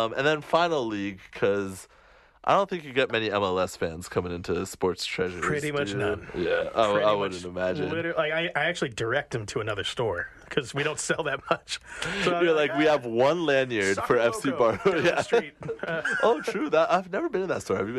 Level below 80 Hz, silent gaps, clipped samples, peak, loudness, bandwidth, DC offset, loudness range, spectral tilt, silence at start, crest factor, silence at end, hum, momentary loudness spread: -56 dBFS; none; under 0.1%; -8 dBFS; -26 LUFS; 13 kHz; under 0.1%; 4 LU; -4.5 dB/octave; 0 s; 18 dB; 0 s; none; 8 LU